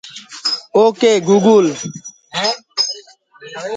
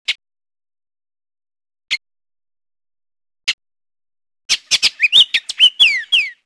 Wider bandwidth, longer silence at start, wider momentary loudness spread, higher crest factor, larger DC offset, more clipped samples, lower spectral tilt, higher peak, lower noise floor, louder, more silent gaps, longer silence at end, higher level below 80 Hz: second, 9.4 kHz vs 11 kHz; about the same, 0.05 s vs 0.1 s; first, 19 LU vs 14 LU; about the same, 16 dB vs 20 dB; neither; neither; first, -4 dB/octave vs 3.5 dB/octave; about the same, 0 dBFS vs 0 dBFS; second, -41 dBFS vs under -90 dBFS; about the same, -15 LUFS vs -13 LUFS; second, none vs 3.53-3.58 s, 4.45-4.49 s; second, 0 s vs 0.15 s; about the same, -66 dBFS vs -62 dBFS